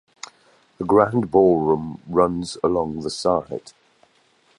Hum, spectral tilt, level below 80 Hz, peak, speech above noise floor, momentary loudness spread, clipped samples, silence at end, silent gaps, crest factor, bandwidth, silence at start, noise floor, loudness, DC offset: none; -6.5 dB/octave; -50 dBFS; -2 dBFS; 40 dB; 17 LU; under 0.1%; 1 s; none; 20 dB; 11 kHz; 0.8 s; -60 dBFS; -20 LUFS; under 0.1%